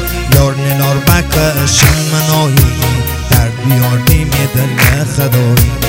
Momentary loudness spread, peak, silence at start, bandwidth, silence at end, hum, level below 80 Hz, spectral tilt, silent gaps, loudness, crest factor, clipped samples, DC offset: 4 LU; 0 dBFS; 0 s; over 20 kHz; 0 s; none; -20 dBFS; -4.5 dB/octave; none; -10 LUFS; 10 dB; 1%; under 0.1%